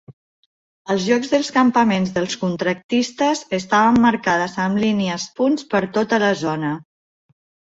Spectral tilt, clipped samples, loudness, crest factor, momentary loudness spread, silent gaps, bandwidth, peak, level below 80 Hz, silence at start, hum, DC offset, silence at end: -5 dB/octave; under 0.1%; -19 LUFS; 16 dB; 8 LU; 0.13-0.85 s, 2.84-2.89 s; 8 kHz; -4 dBFS; -56 dBFS; 0.1 s; none; under 0.1%; 0.9 s